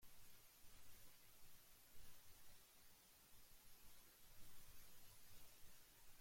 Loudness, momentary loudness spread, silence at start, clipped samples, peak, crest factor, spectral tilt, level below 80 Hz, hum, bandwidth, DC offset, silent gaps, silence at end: -67 LUFS; 2 LU; 0 s; under 0.1%; -48 dBFS; 12 dB; -2 dB/octave; -74 dBFS; none; 16.5 kHz; under 0.1%; none; 0 s